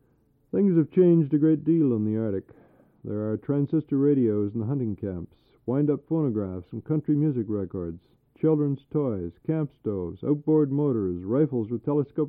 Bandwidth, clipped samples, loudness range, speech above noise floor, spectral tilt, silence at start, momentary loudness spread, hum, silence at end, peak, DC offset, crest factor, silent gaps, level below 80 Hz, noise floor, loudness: 3.6 kHz; under 0.1%; 4 LU; 40 dB; -14 dB/octave; 0.55 s; 12 LU; none; 0 s; -10 dBFS; under 0.1%; 16 dB; none; -60 dBFS; -65 dBFS; -26 LUFS